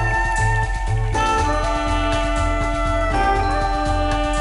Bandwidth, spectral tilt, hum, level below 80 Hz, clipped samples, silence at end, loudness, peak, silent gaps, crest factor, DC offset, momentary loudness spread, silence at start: 11 kHz; -5 dB/octave; none; -24 dBFS; under 0.1%; 0 s; -20 LUFS; -10 dBFS; none; 10 dB; 0.3%; 3 LU; 0 s